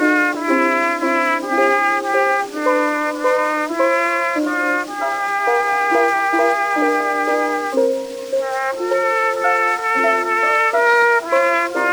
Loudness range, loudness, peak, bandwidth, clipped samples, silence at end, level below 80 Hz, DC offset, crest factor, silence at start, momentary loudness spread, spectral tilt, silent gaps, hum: 2 LU; -17 LUFS; -4 dBFS; over 20 kHz; under 0.1%; 0 s; -66 dBFS; under 0.1%; 14 dB; 0 s; 5 LU; -2.5 dB/octave; none; none